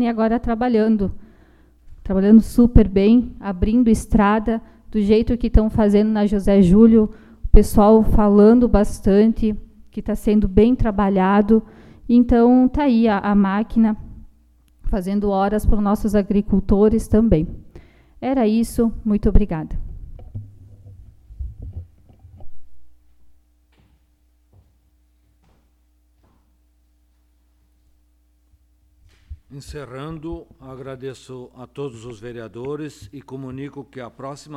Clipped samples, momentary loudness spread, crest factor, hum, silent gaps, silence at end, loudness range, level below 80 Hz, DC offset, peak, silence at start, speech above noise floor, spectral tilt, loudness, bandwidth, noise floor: under 0.1%; 23 LU; 18 dB; none; none; 0 s; 19 LU; -28 dBFS; under 0.1%; 0 dBFS; 0 s; 43 dB; -8 dB/octave; -17 LUFS; 13 kHz; -60 dBFS